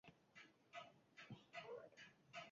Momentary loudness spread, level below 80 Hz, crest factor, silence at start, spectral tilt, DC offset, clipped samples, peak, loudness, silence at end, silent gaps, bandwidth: 10 LU; under -90 dBFS; 18 dB; 0.05 s; -2.5 dB/octave; under 0.1%; under 0.1%; -42 dBFS; -60 LUFS; 0 s; none; 7.4 kHz